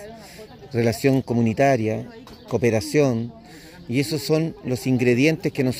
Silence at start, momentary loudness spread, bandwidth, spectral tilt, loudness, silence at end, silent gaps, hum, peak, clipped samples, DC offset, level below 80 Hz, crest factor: 0 s; 21 LU; 16 kHz; -6.5 dB/octave; -22 LUFS; 0 s; none; none; -4 dBFS; under 0.1%; under 0.1%; -54 dBFS; 18 dB